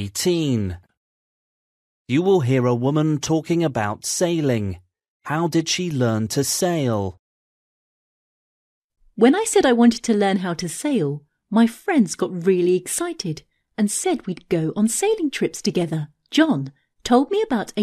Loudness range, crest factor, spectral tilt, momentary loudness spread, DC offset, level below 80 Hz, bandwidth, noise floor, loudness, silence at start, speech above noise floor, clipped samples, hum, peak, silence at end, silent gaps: 4 LU; 18 dB; -5 dB/octave; 11 LU; under 0.1%; -56 dBFS; 14 kHz; under -90 dBFS; -21 LUFS; 0 s; over 70 dB; under 0.1%; none; -2 dBFS; 0 s; 0.97-2.05 s, 5.08-5.20 s, 7.19-8.90 s